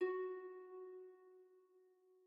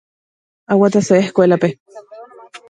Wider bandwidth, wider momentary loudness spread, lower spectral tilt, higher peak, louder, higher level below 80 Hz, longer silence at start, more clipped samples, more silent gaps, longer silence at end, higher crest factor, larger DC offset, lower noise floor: second, 5.2 kHz vs 9.2 kHz; first, 22 LU vs 8 LU; second, -2 dB/octave vs -6.5 dB/octave; second, -30 dBFS vs 0 dBFS; second, -49 LUFS vs -14 LUFS; second, under -90 dBFS vs -62 dBFS; second, 0 s vs 0.7 s; neither; second, none vs 1.80-1.86 s; about the same, 0.1 s vs 0.15 s; about the same, 18 dB vs 16 dB; neither; first, -72 dBFS vs -38 dBFS